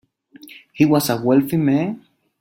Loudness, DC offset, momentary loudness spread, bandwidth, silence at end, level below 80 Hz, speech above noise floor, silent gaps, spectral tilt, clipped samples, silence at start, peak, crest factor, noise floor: -18 LUFS; under 0.1%; 15 LU; 16.5 kHz; 0.4 s; -58 dBFS; 29 dB; none; -6.5 dB/octave; under 0.1%; 0.55 s; -2 dBFS; 18 dB; -45 dBFS